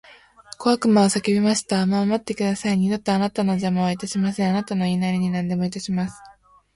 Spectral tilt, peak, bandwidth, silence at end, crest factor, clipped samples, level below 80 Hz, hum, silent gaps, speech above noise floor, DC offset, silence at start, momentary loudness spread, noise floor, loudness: -5.5 dB/octave; -6 dBFS; 11.5 kHz; 0.45 s; 16 dB; under 0.1%; -56 dBFS; none; none; 24 dB; under 0.1%; 0.6 s; 7 LU; -45 dBFS; -22 LUFS